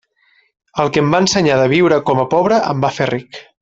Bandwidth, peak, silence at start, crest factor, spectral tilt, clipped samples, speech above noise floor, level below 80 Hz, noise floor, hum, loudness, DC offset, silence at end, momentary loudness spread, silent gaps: 8 kHz; 0 dBFS; 0.75 s; 14 dB; -5 dB/octave; under 0.1%; 43 dB; -50 dBFS; -57 dBFS; none; -14 LUFS; under 0.1%; 0.2 s; 8 LU; none